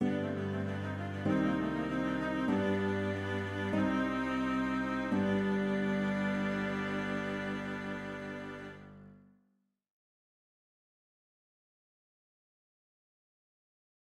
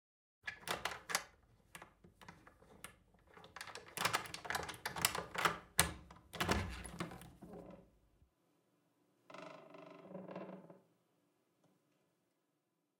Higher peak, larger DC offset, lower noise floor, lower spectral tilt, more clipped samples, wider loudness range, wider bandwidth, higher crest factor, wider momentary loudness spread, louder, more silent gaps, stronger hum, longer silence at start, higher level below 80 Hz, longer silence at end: second, -18 dBFS vs -8 dBFS; neither; second, -77 dBFS vs -85 dBFS; first, -7 dB/octave vs -2 dB/octave; neither; second, 12 LU vs 17 LU; second, 11.5 kHz vs 17.5 kHz; second, 18 dB vs 38 dB; second, 9 LU vs 22 LU; first, -34 LUFS vs -40 LUFS; neither; first, 50 Hz at -65 dBFS vs none; second, 0 s vs 0.45 s; about the same, -60 dBFS vs -62 dBFS; first, 4.95 s vs 2.2 s